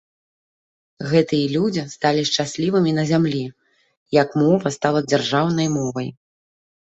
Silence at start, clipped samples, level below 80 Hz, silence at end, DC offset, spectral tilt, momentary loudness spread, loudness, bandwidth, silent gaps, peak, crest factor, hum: 1 s; under 0.1%; -60 dBFS; 0.7 s; under 0.1%; -5.5 dB/octave; 8 LU; -20 LUFS; 8.2 kHz; 3.97-4.06 s; -2 dBFS; 18 dB; none